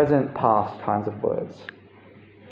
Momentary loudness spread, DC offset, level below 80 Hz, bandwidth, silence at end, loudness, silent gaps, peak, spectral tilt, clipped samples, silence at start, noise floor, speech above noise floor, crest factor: 17 LU; under 0.1%; -60 dBFS; 7 kHz; 0 s; -24 LUFS; none; -6 dBFS; -9.5 dB/octave; under 0.1%; 0 s; -49 dBFS; 26 dB; 20 dB